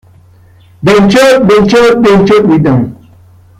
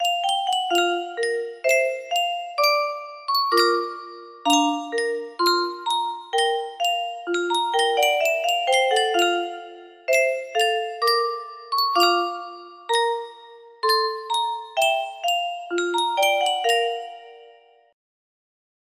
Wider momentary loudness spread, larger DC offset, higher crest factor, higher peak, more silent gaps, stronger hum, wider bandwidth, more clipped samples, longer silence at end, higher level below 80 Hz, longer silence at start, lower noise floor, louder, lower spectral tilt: second, 7 LU vs 10 LU; neither; second, 8 dB vs 18 dB; first, 0 dBFS vs -6 dBFS; neither; neither; about the same, 15.5 kHz vs 15.5 kHz; neither; second, 0.65 s vs 1.4 s; first, -36 dBFS vs -74 dBFS; first, 0.8 s vs 0 s; second, -40 dBFS vs -52 dBFS; first, -6 LUFS vs -22 LUFS; first, -6 dB/octave vs 0 dB/octave